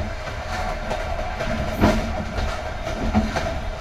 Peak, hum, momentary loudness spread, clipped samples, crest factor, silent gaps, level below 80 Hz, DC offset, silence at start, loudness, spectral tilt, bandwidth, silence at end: -4 dBFS; none; 9 LU; under 0.1%; 20 dB; none; -30 dBFS; under 0.1%; 0 s; -25 LUFS; -6 dB/octave; 16 kHz; 0 s